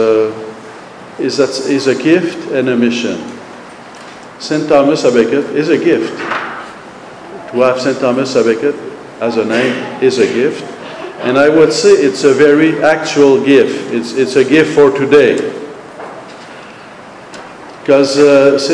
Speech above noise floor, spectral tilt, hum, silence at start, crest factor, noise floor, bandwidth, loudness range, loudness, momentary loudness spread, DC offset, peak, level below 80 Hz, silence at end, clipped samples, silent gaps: 22 dB; -5 dB/octave; none; 0 s; 12 dB; -33 dBFS; 10.5 kHz; 6 LU; -11 LUFS; 23 LU; under 0.1%; 0 dBFS; -56 dBFS; 0 s; under 0.1%; none